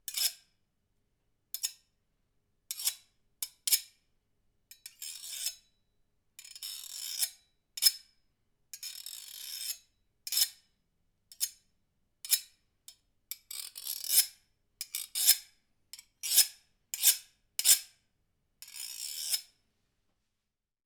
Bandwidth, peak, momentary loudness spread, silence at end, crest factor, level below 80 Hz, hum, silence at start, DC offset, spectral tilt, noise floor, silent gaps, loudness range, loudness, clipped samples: over 20 kHz; -4 dBFS; 21 LU; 1.45 s; 32 dB; -80 dBFS; none; 0.1 s; under 0.1%; 5.5 dB/octave; -86 dBFS; none; 9 LU; -30 LUFS; under 0.1%